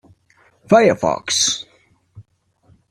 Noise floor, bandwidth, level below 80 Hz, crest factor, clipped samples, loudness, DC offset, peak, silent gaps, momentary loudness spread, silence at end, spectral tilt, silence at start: -58 dBFS; 14 kHz; -58 dBFS; 18 dB; under 0.1%; -16 LUFS; under 0.1%; -2 dBFS; none; 7 LU; 0.7 s; -3 dB/octave; 0.7 s